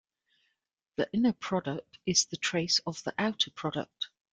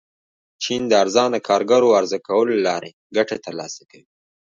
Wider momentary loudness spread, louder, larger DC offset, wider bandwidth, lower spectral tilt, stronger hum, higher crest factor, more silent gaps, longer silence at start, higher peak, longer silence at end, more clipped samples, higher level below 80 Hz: second, 11 LU vs 14 LU; second, -30 LUFS vs -19 LUFS; neither; first, 10 kHz vs 7.6 kHz; about the same, -3 dB/octave vs -3.5 dB/octave; neither; about the same, 20 dB vs 18 dB; second, none vs 2.93-3.10 s; first, 1 s vs 0.6 s; second, -12 dBFS vs -2 dBFS; second, 0.25 s vs 0.65 s; neither; about the same, -68 dBFS vs -66 dBFS